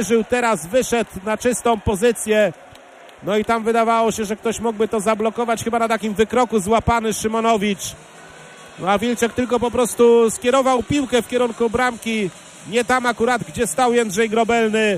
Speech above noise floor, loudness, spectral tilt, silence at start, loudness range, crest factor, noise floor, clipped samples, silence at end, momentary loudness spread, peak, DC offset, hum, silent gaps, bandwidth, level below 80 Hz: 25 dB; -19 LUFS; -4 dB/octave; 0 s; 2 LU; 16 dB; -43 dBFS; under 0.1%; 0 s; 6 LU; -4 dBFS; under 0.1%; none; none; 15.5 kHz; -44 dBFS